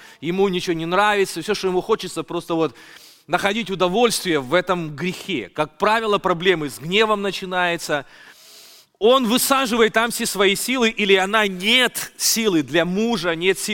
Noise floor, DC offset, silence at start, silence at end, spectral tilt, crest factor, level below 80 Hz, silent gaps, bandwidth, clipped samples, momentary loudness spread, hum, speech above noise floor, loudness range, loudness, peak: -47 dBFS; under 0.1%; 0 s; 0 s; -3 dB/octave; 18 dB; -52 dBFS; none; 17 kHz; under 0.1%; 9 LU; none; 27 dB; 4 LU; -19 LUFS; -2 dBFS